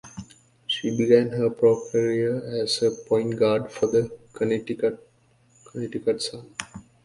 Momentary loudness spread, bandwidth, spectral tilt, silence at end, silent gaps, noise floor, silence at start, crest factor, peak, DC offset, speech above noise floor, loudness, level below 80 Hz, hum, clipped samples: 17 LU; 11.5 kHz; -5.5 dB/octave; 0.25 s; none; -60 dBFS; 0.05 s; 20 dB; -4 dBFS; under 0.1%; 37 dB; -24 LUFS; -62 dBFS; none; under 0.1%